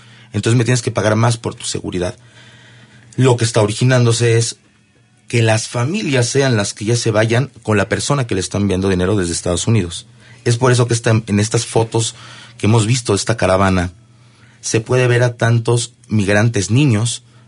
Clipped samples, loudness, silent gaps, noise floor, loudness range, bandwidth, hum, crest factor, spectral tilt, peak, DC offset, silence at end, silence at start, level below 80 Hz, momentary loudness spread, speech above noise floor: under 0.1%; -16 LUFS; none; -52 dBFS; 2 LU; 11 kHz; none; 14 dB; -5 dB/octave; -2 dBFS; under 0.1%; 0.3 s; 0.35 s; -48 dBFS; 8 LU; 37 dB